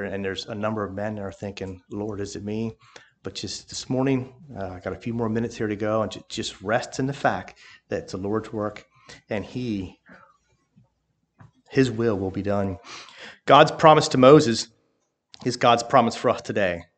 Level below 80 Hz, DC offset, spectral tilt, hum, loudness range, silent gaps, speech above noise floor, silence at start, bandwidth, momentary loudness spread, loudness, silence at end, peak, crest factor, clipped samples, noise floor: -58 dBFS; under 0.1%; -5.5 dB/octave; none; 13 LU; none; 50 dB; 0 s; 9.2 kHz; 19 LU; -23 LUFS; 0.15 s; 0 dBFS; 24 dB; under 0.1%; -73 dBFS